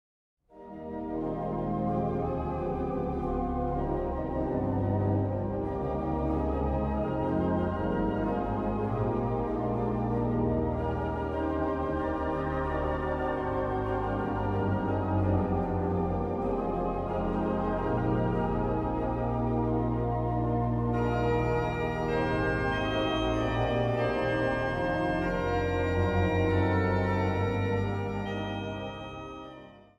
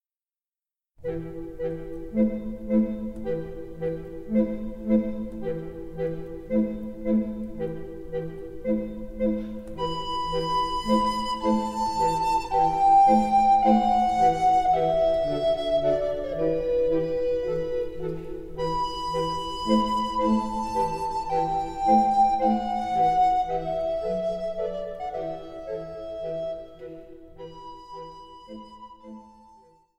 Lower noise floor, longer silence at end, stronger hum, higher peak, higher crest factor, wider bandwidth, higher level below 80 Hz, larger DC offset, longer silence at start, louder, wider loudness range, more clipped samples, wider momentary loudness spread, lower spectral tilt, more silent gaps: second, -49 dBFS vs under -90 dBFS; second, 0.2 s vs 0.7 s; neither; second, -14 dBFS vs -8 dBFS; about the same, 14 dB vs 18 dB; second, 8 kHz vs 12.5 kHz; about the same, -40 dBFS vs -44 dBFS; neither; second, 0.55 s vs 1 s; second, -30 LUFS vs -25 LUFS; second, 3 LU vs 12 LU; neither; second, 5 LU vs 17 LU; first, -8.5 dB/octave vs -6.5 dB/octave; neither